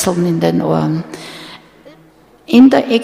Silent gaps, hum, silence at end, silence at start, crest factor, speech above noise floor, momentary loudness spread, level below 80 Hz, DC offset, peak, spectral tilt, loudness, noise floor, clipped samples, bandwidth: none; none; 0 s; 0 s; 14 dB; 35 dB; 22 LU; -50 dBFS; under 0.1%; 0 dBFS; -6 dB/octave; -12 LUFS; -46 dBFS; under 0.1%; 15 kHz